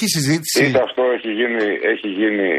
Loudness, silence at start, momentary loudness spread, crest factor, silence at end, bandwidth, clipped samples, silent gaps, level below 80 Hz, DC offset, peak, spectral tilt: -18 LUFS; 0 s; 4 LU; 14 dB; 0 s; 15 kHz; under 0.1%; none; -60 dBFS; under 0.1%; -4 dBFS; -4 dB/octave